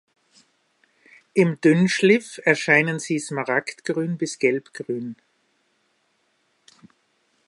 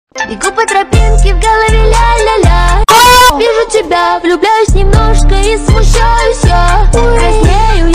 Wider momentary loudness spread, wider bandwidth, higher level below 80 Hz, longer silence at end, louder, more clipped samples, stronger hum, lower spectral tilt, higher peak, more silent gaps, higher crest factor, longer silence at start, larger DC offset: first, 13 LU vs 6 LU; second, 11.5 kHz vs 16.5 kHz; second, -74 dBFS vs -10 dBFS; first, 2.35 s vs 0 s; second, -21 LUFS vs -8 LUFS; second, under 0.1% vs 0.2%; neither; about the same, -5.5 dB/octave vs -4.5 dB/octave; about the same, -2 dBFS vs 0 dBFS; neither; first, 22 dB vs 6 dB; first, 1.35 s vs 0.15 s; neither